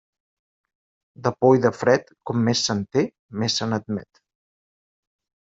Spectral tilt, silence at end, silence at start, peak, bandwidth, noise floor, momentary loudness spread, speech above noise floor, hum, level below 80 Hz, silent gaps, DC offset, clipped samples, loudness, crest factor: -5 dB/octave; 1.45 s; 1.2 s; -4 dBFS; 7.8 kHz; under -90 dBFS; 10 LU; over 69 dB; none; -62 dBFS; 3.19-3.29 s; under 0.1%; under 0.1%; -22 LUFS; 20 dB